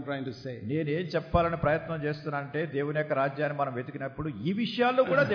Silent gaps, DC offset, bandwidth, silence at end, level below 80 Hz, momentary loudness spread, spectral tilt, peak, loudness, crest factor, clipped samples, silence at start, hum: none; under 0.1%; 5.4 kHz; 0 s; -48 dBFS; 10 LU; -8 dB/octave; -10 dBFS; -30 LUFS; 18 dB; under 0.1%; 0 s; none